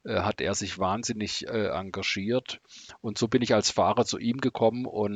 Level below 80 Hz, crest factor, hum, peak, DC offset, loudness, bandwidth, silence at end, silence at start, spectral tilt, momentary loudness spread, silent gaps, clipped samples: -62 dBFS; 18 dB; none; -10 dBFS; under 0.1%; -27 LUFS; 9.4 kHz; 0 s; 0.05 s; -4 dB/octave; 9 LU; none; under 0.1%